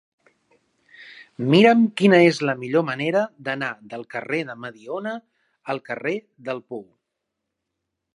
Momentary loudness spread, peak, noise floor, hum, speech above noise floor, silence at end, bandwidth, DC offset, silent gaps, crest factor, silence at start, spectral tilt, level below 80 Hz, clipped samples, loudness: 21 LU; -2 dBFS; -81 dBFS; none; 60 dB; 1.35 s; 11.5 kHz; under 0.1%; none; 22 dB; 1 s; -6.5 dB/octave; -74 dBFS; under 0.1%; -21 LUFS